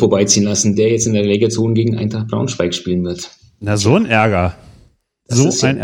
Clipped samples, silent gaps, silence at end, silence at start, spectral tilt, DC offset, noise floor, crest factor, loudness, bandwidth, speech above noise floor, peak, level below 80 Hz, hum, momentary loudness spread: under 0.1%; none; 0 s; 0 s; -4.5 dB/octave; under 0.1%; -52 dBFS; 16 dB; -15 LUFS; 16 kHz; 37 dB; 0 dBFS; -44 dBFS; none; 8 LU